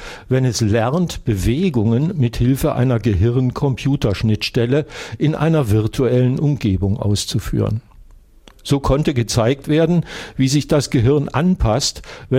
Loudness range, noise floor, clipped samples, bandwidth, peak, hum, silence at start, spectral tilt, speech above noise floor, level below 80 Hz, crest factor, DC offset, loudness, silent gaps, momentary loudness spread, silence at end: 2 LU; -45 dBFS; under 0.1%; 16 kHz; -4 dBFS; none; 0 s; -6.5 dB/octave; 29 dB; -34 dBFS; 14 dB; under 0.1%; -18 LUFS; none; 5 LU; 0 s